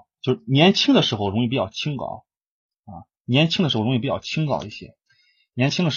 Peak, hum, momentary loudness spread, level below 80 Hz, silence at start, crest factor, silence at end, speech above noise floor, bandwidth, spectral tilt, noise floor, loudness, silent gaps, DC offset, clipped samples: -2 dBFS; none; 18 LU; -58 dBFS; 0.25 s; 20 dB; 0 s; 42 dB; 7.4 kHz; -5.5 dB/octave; -63 dBFS; -21 LUFS; 2.37-2.41 s, 2.47-2.69 s, 2.79-2.83 s, 3.20-3.25 s; under 0.1%; under 0.1%